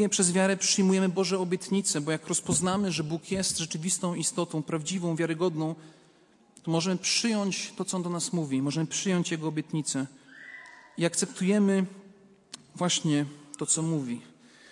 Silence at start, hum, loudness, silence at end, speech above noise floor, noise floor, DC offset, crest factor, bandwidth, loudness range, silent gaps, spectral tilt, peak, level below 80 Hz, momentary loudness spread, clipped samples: 0 s; none; -28 LUFS; 0.4 s; 33 dB; -61 dBFS; under 0.1%; 22 dB; 11.5 kHz; 4 LU; none; -4 dB/octave; -8 dBFS; -68 dBFS; 13 LU; under 0.1%